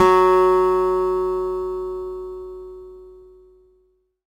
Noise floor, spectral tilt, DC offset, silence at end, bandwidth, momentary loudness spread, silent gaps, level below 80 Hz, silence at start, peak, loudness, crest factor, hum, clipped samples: -63 dBFS; -6 dB/octave; under 0.1%; 1.15 s; 13 kHz; 23 LU; none; -46 dBFS; 0 s; 0 dBFS; -19 LUFS; 20 dB; none; under 0.1%